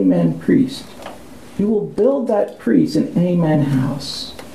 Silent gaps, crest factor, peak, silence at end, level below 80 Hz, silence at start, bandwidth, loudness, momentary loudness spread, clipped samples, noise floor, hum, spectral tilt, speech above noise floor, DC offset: none; 14 dB; -2 dBFS; 0 s; -50 dBFS; 0 s; 14 kHz; -17 LUFS; 15 LU; under 0.1%; -38 dBFS; none; -7.5 dB/octave; 21 dB; 0.6%